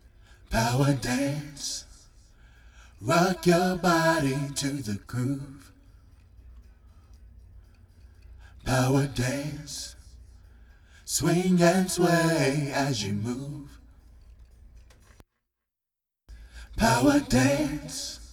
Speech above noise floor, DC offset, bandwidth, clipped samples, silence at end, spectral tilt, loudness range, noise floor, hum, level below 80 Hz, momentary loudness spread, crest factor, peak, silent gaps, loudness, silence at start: 63 dB; under 0.1%; 17.5 kHz; under 0.1%; 0 s; -5 dB/octave; 11 LU; -88 dBFS; none; -48 dBFS; 15 LU; 20 dB; -8 dBFS; none; -26 LUFS; 0.5 s